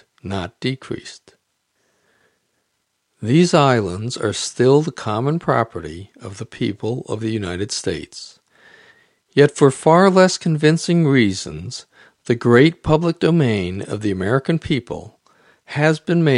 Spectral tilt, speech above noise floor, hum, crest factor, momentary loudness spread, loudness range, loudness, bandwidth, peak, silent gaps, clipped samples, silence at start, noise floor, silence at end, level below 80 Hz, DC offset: -6 dB/octave; 53 dB; none; 18 dB; 19 LU; 9 LU; -18 LUFS; 11.5 kHz; 0 dBFS; none; under 0.1%; 0.25 s; -71 dBFS; 0 s; -50 dBFS; under 0.1%